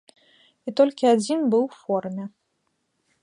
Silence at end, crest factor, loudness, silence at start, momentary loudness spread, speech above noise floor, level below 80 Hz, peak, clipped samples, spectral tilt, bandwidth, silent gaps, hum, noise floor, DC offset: 0.95 s; 18 dB; -22 LUFS; 0.65 s; 16 LU; 52 dB; -78 dBFS; -6 dBFS; under 0.1%; -5.5 dB/octave; 11 kHz; none; none; -74 dBFS; under 0.1%